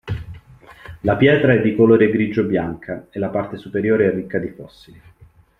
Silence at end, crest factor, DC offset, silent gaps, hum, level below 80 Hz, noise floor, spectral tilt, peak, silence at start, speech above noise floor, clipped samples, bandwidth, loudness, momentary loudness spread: 0.95 s; 16 dB; under 0.1%; none; none; -48 dBFS; -50 dBFS; -9 dB/octave; -2 dBFS; 0.05 s; 32 dB; under 0.1%; 5.6 kHz; -18 LUFS; 17 LU